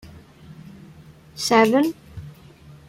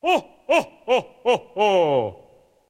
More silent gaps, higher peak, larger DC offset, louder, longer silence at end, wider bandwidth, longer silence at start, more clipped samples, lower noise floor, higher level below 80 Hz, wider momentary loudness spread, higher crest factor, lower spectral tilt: neither; first, -2 dBFS vs -6 dBFS; neither; first, -19 LUFS vs -22 LUFS; about the same, 0.6 s vs 0.55 s; about the same, 16.5 kHz vs 15.5 kHz; about the same, 0.05 s vs 0.05 s; neither; second, -46 dBFS vs -54 dBFS; first, -54 dBFS vs -64 dBFS; first, 27 LU vs 5 LU; first, 22 dB vs 16 dB; about the same, -4 dB/octave vs -4.5 dB/octave